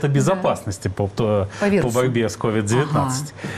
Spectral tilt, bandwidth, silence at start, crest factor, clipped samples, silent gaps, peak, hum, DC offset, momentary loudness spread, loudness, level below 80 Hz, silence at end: -6 dB/octave; 14.5 kHz; 0 s; 12 dB; under 0.1%; none; -8 dBFS; none; under 0.1%; 6 LU; -21 LUFS; -48 dBFS; 0 s